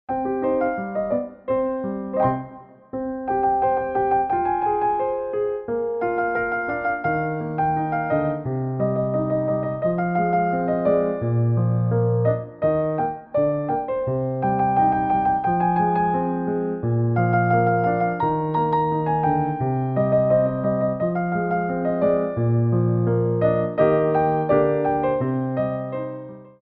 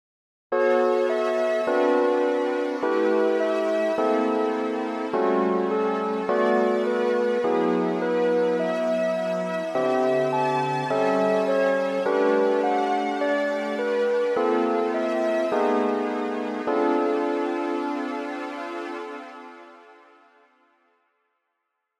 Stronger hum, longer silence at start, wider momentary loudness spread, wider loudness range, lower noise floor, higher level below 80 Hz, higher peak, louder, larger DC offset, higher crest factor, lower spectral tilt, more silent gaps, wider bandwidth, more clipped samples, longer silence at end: neither; second, 0.1 s vs 0.5 s; about the same, 6 LU vs 7 LU; second, 3 LU vs 7 LU; second, -42 dBFS vs -79 dBFS; first, -50 dBFS vs -80 dBFS; first, -6 dBFS vs -10 dBFS; about the same, -22 LUFS vs -24 LUFS; neither; about the same, 14 dB vs 14 dB; first, -9 dB/octave vs -6 dB/octave; neither; second, 4 kHz vs 11.5 kHz; neither; second, 0.15 s vs 2.05 s